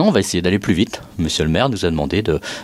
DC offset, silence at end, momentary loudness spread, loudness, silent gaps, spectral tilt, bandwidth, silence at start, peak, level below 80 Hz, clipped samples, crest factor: under 0.1%; 0 s; 5 LU; -18 LUFS; none; -5 dB/octave; 15 kHz; 0 s; -2 dBFS; -36 dBFS; under 0.1%; 16 dB